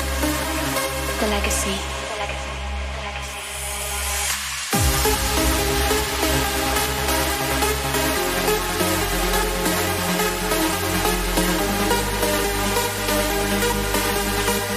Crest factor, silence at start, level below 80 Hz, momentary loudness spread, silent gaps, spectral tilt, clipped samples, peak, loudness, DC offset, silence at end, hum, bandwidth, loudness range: 16 dB; 0 s; -30 dBFS; 7 LU; none; -3 dB/octave; under 0.1%; -6 dBFS; -21 LUFS; under 0.1%; 0 s; none; 16 kHz; 4 LU